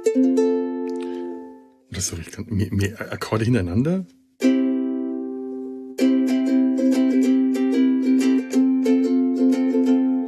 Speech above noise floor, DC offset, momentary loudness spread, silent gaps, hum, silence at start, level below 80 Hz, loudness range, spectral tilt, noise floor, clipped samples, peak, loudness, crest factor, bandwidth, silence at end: 22 dB; under 0.1%; 12 LU; none; none; 0 s; -54 dBFS; 6 LU; -6.5 dB/octave; -43 dBFS; under 0.1%; -6 dBFS; -21 LUFS; 14 dB; 13 kHz; 0 s